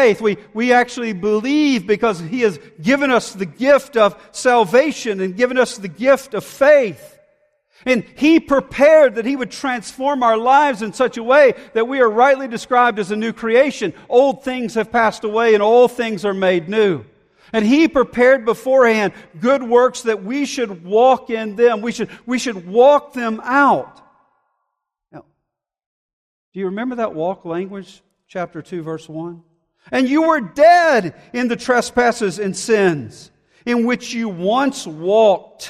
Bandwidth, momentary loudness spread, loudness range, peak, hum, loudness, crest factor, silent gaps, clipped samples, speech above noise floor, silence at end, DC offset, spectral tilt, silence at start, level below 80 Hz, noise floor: 14 kHz; 13 LU; 11 LU; 0 dBFS; none; -16 LUFS; 16 dB; 25.86-26.52 s; under 0.1%; 62 dB; 0 s; under 0.1%; -5 dB/octave; 0 s; -56 dBFS; -78 dBFS